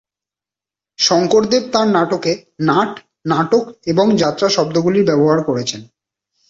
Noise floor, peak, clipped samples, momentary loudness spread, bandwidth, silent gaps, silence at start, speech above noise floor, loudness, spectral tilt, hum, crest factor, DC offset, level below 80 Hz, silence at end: -89 dBFS; -2 dBFS; under 0.1%; 8 LU; 7.8 kHz; none; 1 s; 74 dB; -15 LUFS; -5 dB/octave; none; 14 dB; under 0.1%; -56 dBFS; 0.65 s